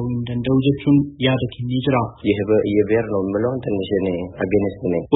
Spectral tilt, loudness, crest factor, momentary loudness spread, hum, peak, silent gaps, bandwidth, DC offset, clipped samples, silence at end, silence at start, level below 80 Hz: -12.5 dB/octave; -20 LUFS; 18 dB; 6 LU; none; -2 dBFS; none; 4 kHz; under 0.1%; under 0.1%; 0 s; 0 s; -46 dBFS